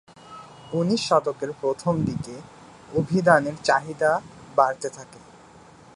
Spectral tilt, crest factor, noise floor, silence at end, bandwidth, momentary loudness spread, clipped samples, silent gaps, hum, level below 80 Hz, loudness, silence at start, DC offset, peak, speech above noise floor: -5.5 dB/octave; 22 dB; -49 dBFS; 0.8 s; 11.5 kHz; 22 LU; under 0.1%; none; none; -58 dBFS; -23 LUFS; 0.3 s; under 0.1%; -2 dBFS; 26 dB